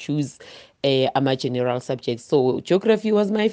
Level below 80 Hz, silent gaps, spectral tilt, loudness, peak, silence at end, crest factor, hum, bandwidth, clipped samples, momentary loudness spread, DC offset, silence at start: -64 dBFS; none; -6.5 dB/octave; -22 LUFS; -6 dBFS; 0 s; 16 dB; none; 9.4 kHz; under 0.1%; 7 LU; under 0.1%; 0 s